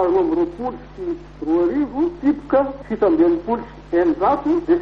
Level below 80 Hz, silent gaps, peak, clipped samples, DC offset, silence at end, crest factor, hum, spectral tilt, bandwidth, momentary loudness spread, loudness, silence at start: -44 dBFS; none; -6 dBFS; under 0.1%; under 0.1%; 0 s; 14 dB; none; -8.5 dB/octave; 5.4 kHz; 11 LU; -20 LUFS; 0 s